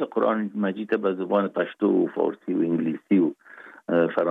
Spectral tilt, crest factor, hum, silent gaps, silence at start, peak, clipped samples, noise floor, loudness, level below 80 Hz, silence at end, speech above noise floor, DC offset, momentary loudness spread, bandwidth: -9.5 dB/octave; 16 dB; none; none; 0 s; -8 dBFS; under 0.1%; -47 dBFS; -24 LUFS; -78 dBFS; 0 s; 24 dB; under 0.1%; 5 LU; 4.3 kHz